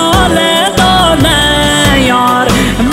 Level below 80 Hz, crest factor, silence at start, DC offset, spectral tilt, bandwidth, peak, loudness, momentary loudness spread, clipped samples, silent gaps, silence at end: -22 dBFS; 8 dB; 0 s; under 0.1%; -4 dB/octave; 16.5 kHz; 0 dBFS; -8 LUFS; 2 LU; under 0.1%; none; 0 s